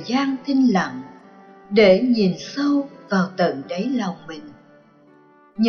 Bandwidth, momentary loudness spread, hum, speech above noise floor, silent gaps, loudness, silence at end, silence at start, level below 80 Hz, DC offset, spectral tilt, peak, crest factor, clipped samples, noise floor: 6.8 kHz; 21 LU; none; 32 dB; none; -20 LUFS; 0 s; 0 s; -60 dBFS; under 0.1%; -6.5 dB/octave; -4 dBFS; 16 dB; under 0.1%; -52 dBFS